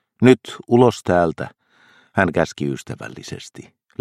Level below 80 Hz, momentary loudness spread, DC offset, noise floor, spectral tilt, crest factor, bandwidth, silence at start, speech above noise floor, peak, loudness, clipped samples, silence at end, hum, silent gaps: -52 dBFS; 19 LU; under 0.1%; -54 dBFS; -6.5 dB/octave; 20 dB; 13.5 kHz; 0.2 s; 36 dB; 0 dBFS; -18 LUFS; under 0.1%; 0.4 s; none; none